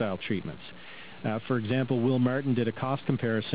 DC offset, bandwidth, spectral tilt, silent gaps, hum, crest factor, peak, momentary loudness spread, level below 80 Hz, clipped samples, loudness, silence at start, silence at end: 0.4%; 4 kHz; -6 dB/octave; none; none; 18 dB; -12 dBFS; 17 LU; -62 dBFS; under 0.1%; -29 LUFS; 0 s; 0 s